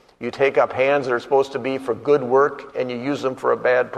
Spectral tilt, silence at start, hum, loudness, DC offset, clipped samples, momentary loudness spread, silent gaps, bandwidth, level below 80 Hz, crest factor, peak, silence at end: -6 dB/octave; 0.2 s; none; -20 LUFS; under 0.1%; under 0.1%; 7 LU; none; 10 kHz; -62 dBFS; 16 dB; -4 dBFS; 0 s